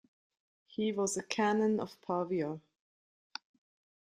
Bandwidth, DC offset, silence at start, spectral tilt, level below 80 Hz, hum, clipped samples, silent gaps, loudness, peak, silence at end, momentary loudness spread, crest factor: 14.5 kHz; under 0.1%; 0.8 s; -4.5 dB/octave; -78 dBFS; none; under 0.1%; none; -34 LUFS; -14 dBFS; 1.45 s; 18 LU; 22 dB